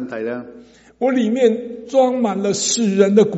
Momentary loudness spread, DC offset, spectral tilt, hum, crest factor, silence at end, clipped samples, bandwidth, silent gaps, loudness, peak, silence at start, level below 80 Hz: 11 LU; under 0.1%; -4.5 dB/octave; none; 18 dB; 0 s; under 0.1%; 8.2 kHz; none; -18 LUFS; 0 dBFS; 0 s; -62 dBFS